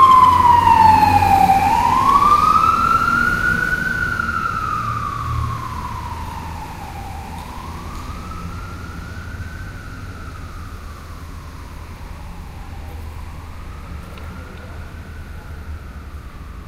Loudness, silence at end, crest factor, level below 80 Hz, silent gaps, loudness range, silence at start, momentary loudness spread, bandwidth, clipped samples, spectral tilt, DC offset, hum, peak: -15 LUFS; 0 s; 18 dB; -34 dBFS; none; 21 LU; 0 s; 23 LU; 16 kHz; under 0.1%; -5 dB/octave; under 0.1%; none; 0 dBFS